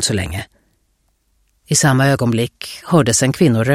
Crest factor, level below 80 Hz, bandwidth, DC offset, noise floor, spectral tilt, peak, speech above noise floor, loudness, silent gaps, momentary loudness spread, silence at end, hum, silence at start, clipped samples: 16 dB; -44 dBFS; 16 kHz; under 0.1%; -63 dBFS; -4.5 dB/octave; 0 dBFS; 48 dB; -15 LUFS; none; 14 LU; 0 s; none; 0 s; under 0.1%